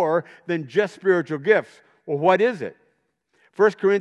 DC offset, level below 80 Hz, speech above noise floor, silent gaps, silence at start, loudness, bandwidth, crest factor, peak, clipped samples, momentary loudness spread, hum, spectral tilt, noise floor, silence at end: under 0.1%; -80 dBFS; 48 dB; none; 0 s; -21 LUFS; 9.2 kHz; 18 dB; -4 dBFS; under 0.1%; 15 LU; none; -6.5 dB/octave; -68 dBFS; 0 s